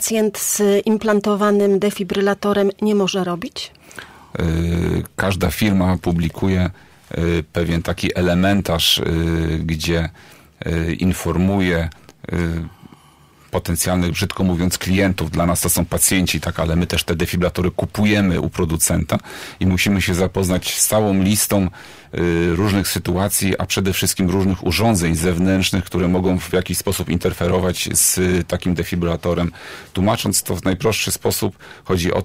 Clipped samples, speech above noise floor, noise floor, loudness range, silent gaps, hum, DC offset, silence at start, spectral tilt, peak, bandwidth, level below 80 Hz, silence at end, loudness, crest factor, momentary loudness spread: under 0.1%; 31 dB; -49 dBFS; 3 LU; none; none; under 0.1%; 0 s; -4.5 dB/octave; -4 dBFS; 16 kHz; -38 dBFS; 0 s; -18 LUFS; 16 dB; 8 LU